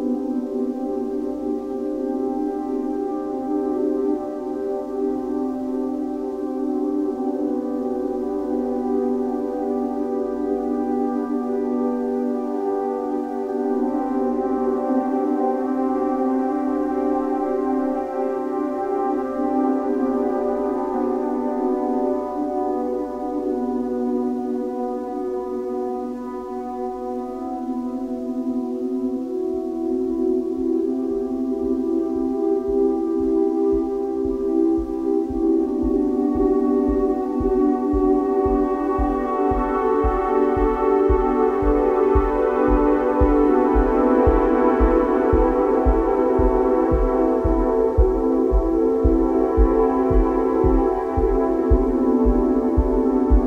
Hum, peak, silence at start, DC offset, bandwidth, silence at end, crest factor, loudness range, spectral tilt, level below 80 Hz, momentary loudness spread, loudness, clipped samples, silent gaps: none; -4 dBFS; 0 s; under 0.1%; 7.2 kHz; 0 s; 16 dB; 7 LU; -9.5 dB/octave; -30 dBFS; 8 LU; -21 LUFS; under 0.1%; none